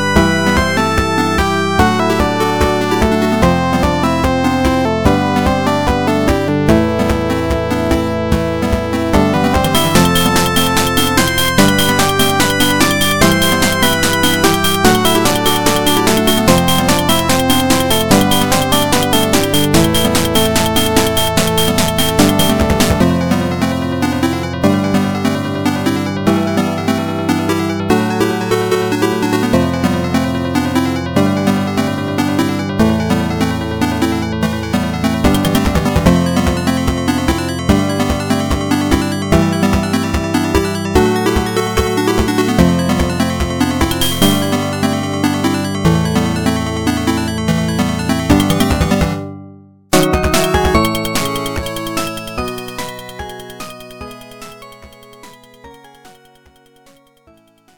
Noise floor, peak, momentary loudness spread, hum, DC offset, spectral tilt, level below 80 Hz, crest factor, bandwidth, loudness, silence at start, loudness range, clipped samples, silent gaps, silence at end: -49 dBFS; 0 dBFS; 6 LU; none; under 0.1%; -4.5 dB/octave; -28 dBFS; 14 dB; 17.5 kHz; -14 LUFS; 0 s; 4 LU; under 0.1%; none; 1.65 s